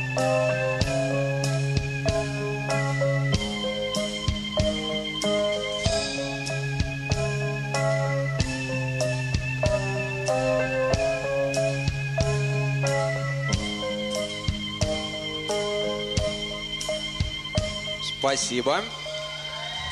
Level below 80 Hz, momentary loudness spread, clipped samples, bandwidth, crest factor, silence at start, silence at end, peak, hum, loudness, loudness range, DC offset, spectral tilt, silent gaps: -40 dBFS; 5 LU; under 0.1%; 12.5 kHz; 20 dB; 0 s; 0 s; -6 dBFS; none; -26 LUFS; 2 LU; under 0.1%; -4.5 dB/octave; none